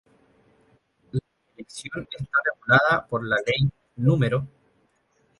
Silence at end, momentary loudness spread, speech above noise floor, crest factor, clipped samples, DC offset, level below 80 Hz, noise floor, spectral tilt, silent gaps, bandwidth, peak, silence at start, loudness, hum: 0.9 s; 16 LU; 43 dB; 24 dB; under 0.1%; under 0.1%; -54 dBFS; -66 dBFS; -6 dB/octave; none; 11.5 kHz; -2 dBFS; 1.15 s; -24 LUFS; none